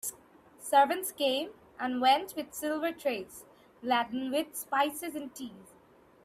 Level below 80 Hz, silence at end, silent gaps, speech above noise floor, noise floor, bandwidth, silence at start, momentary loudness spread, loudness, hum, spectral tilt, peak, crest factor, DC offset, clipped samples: -74 dBFS; 0.6 s; none; 30 dB; -60 dBFS; 16 kHz; 0.05 s; 17 LU; -31 LUFS; none; -2 dB/octave; -12 dBFS; 20 dB; under 0.1%; under 0.1%